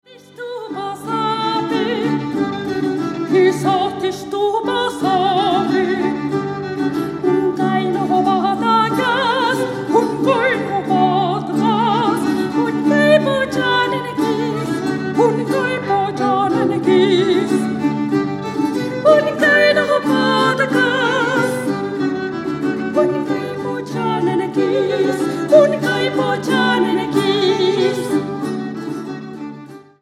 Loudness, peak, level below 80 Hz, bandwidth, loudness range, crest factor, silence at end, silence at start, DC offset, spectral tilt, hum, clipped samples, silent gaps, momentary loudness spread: -17 LUFS; 0 dBFS; -56 dBFS; 14.5 kHz; 4 LU; 16 dB; 0.2 s; 0.1 s; under 0.1%; -5.5 dB/octave; none; under 0.1%; none; 9 LU